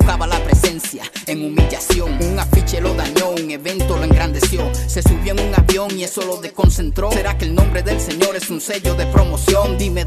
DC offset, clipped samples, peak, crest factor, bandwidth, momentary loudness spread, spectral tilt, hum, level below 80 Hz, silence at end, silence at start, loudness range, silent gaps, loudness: under 0.1%; under 0.1%; -2 dBFS; 14 dB; 14 kHz; 7 LU; -5 dB/octave; none; -18 dBFS; 0 s; 0 s; 1 LU; none; -17 LUFS